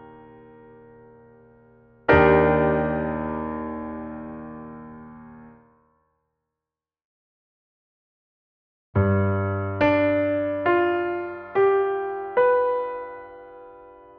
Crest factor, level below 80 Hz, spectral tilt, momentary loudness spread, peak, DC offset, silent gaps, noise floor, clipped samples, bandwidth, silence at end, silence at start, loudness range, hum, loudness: 22 dB; -46 dBFS; -6.5 dB/octave; 22 LU; -2 dBFS; under 0.1%; 7.04-8.93 s; -89 dBFS; under 0.1%; 5.2 kHz; 0.3 s; 0 s; 14 LU; none; -22 LUFS